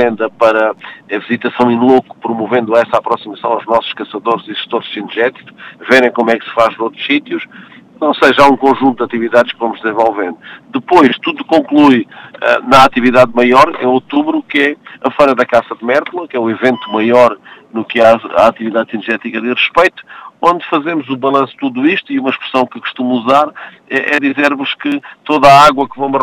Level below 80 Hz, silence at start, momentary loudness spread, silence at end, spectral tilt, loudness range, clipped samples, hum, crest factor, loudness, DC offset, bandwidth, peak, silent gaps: -48 dBFS; 0 s; 11 LU; 0 s; -5 dB/octave; 5 LU; 0.7%; none; 12 dB; -12 LUFS; under 0.1%; 15.5 kHz; 0 dBFS; none